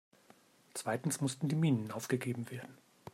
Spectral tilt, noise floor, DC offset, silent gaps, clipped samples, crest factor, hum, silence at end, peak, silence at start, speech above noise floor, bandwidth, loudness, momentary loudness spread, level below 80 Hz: -5.5 dB/octave; -65 dBFS; under 0.1%; none; under 0.1%; 18 dB; none; 0.05 s; -20 dBFS; 0.75 s; 30 dB; 16 kHz; -36 LUFS; 15 LU; -78 dBFS